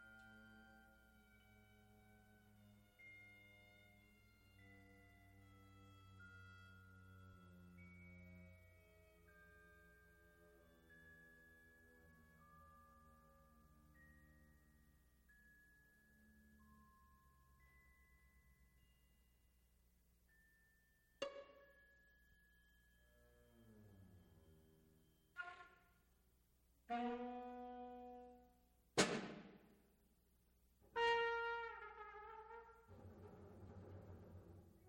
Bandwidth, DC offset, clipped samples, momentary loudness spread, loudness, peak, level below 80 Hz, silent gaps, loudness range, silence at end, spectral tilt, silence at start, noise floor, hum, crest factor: 16.5 kHz; under 0.1%; under 0.1%; 24 LU; -48 LUFS; -20 dBFS; -76 dBFS; none; 21 LU; 0 s; -3.5 dB/octave; 0 s; -77 dBFS; 60 Hz at -80 dBFS; 34 dB